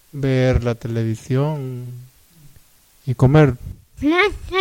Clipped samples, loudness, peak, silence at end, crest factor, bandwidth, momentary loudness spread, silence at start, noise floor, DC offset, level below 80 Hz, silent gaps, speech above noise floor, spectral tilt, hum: under 0.1%; -19 LUFS; -4 dBFS; 0 s; 16 dB; 15.5 kHz; 18 LU; 0.15 s; -52 dBFS; under 0.1%; -36 dBFS; none; 34 dB; -7.5 dB/octave; none